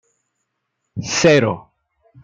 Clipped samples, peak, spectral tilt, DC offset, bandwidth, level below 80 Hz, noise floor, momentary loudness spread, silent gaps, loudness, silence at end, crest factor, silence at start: under 0.1%; -2 dBFS; -4.5 dB/octave; under 0.1%; 9.4 kHz; -54 dBFS; -75 dBFS; 18 LU; none; -16 LUFS; 0.65 s; 18 dB; 0.95 s